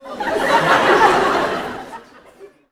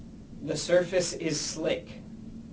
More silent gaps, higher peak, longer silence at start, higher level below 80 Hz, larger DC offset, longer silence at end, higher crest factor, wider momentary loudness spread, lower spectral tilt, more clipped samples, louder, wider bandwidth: neither; first, 0 dBFS vs -10 dBFS; about the same, 0.05 s vs 0 s; first, -48 dBFS vs -54 dBFS; neither; first, 0.25 s vs 0 s; about the same, 18 dB vs 20 dB; about the same, 17 LU vs 19 LU; about the same, -4 dB/octave vs -3.5 dB/octave; neither; first, -15 LUFS vs -29 LUFS; first, 17.5 kHz vs 8 kHz